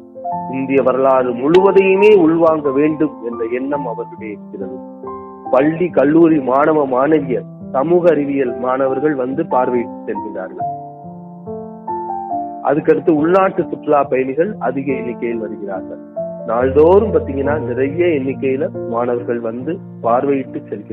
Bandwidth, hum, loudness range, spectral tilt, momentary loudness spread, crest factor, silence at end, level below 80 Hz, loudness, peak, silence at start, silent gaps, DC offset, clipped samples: 5.6 kHz; none; 7 LU; -9 dB/octave; 17 LU; 16 dB; 0 s; -54 dBFS; -16 LUFS; 0 dBFS; 0 s; none; under 0.1%; under 0.1%